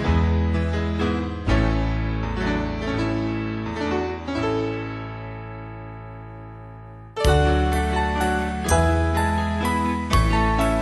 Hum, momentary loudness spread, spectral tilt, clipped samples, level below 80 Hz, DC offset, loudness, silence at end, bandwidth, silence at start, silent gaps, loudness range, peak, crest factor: none; 17 LU; -6 dB/octave; under 0.1%; -28 dBFS; under 0.1%; -23 LUFS; 0 s; 12 kHz; 0 s; none; 7 LU; -6 dBFS; 18 dB